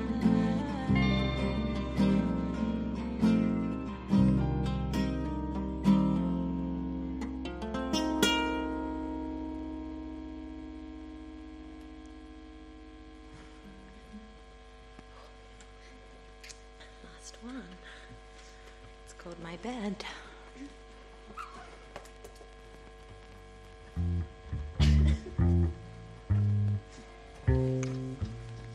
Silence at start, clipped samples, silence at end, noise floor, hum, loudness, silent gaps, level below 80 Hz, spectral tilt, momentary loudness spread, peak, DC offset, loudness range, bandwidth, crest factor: 0 s; under 0.1%; 0 s; -52 dBFS; none; -31 LUFS; none; -40 dBFS; -6.5 dB/octave; 24 LU; -10 dBFS; under 0.1%; 21 LU; 13 kHz; 22 dB